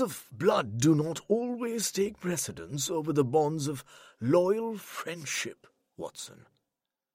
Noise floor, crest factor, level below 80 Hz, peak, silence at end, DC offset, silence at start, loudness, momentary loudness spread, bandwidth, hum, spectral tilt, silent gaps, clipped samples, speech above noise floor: -88 dBFS; 18 dB; -68 dBFS; -12 dBFS; 0.8 s; under 0.1%; 0 s; -30 LUFS; 15 LU; 16 kHz; none; -5 dB/octave; none; under 0.1%; 58 dB